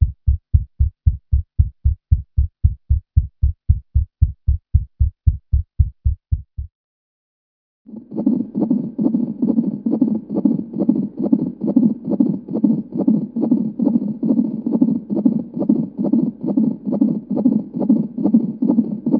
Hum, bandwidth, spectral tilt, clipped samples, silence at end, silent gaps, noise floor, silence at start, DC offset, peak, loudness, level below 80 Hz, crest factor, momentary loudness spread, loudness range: none; 1.4 kHz; -15 dB/octave; under 0.1%; 0 s; 6.75-7.85 s; under -90 dBFS; 0 s; under 0.1%; 0 dBFS; -20 LUFS; -24 dBFS; 18 dB; 5 LU; 5 LU